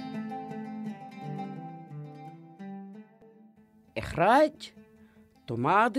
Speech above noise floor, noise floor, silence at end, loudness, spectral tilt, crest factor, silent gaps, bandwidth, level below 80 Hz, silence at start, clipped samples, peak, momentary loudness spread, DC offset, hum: 34 dB; -59 dBFS; 0 s; -29 LUFS; -6.5 dB/octave; 20 dB; none; 15 kHz; -60 dBFS; 0 s; under 0.1%; -12 dBFS; 23 LU; under 0.1%; none